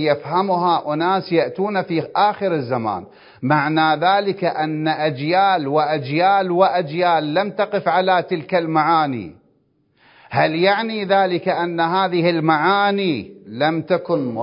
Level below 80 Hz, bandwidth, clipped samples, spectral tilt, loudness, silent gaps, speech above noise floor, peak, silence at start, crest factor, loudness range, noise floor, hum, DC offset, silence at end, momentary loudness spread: -64 dBFS; 5.4 kHz; under 0.1%; -10.5 dB/octave; -18 LUFS; none; 44 dB; 0 dBFS; 0 s; 18 dB; 2 LU; -62 dBFS; none; under 0.1%; 0 s; 6 LU